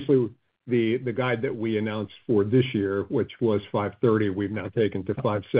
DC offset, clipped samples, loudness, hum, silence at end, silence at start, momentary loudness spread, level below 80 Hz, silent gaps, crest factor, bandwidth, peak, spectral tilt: under 0.1%; under 0.1%; -26 LUFS; none; 0 s; 0 s; 6 LU; -64 dBFS; none; 16 dB; 5 kHz; -10 dBFS; -6.5 dB/octave